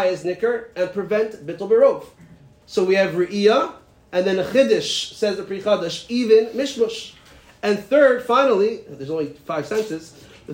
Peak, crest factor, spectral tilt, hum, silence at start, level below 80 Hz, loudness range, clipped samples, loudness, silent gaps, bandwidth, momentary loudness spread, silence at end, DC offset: -4 dBFS; 16 dB; -4.5 dB/octave; none; 0 s; -60 dBFS; 2 LU; under 0.1%; -20 LUFS; none; 16 kHz; 12 LU; 0 s; under 0.1%